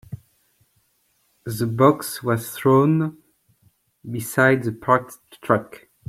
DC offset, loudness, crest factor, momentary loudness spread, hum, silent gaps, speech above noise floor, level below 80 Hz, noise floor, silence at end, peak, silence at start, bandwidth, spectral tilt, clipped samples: under 0.1%; -20 LUFS; 20 dB; 21 LU; none; none; 46 dB; -60 dBFS; -66 dBFS; 0.3 s; -2 dBFS; 0.1 s; 16.5 kHz; -6.5 dB/octave; under 0.1%